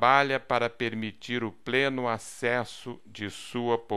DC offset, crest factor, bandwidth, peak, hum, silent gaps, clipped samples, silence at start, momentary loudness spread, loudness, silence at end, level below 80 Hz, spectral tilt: 0.3%; 22 dB; 13 kHz; -6 dBFS; none; none; under 0.1%; 0 s; 13 LU; -29 LUFS; 0 s; -64 dBFS; -4.5 dB/octave